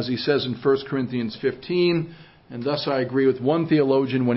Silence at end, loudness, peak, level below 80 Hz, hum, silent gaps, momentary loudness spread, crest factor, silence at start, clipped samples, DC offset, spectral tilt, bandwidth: 0 s; -23 LUFS; -8 dBFS; -60 dBFS; none; none; 7 LU; 14 dB; 0 s; under 0.1%; under 0.1%; -10.5 dB/octave; 5.8 kHz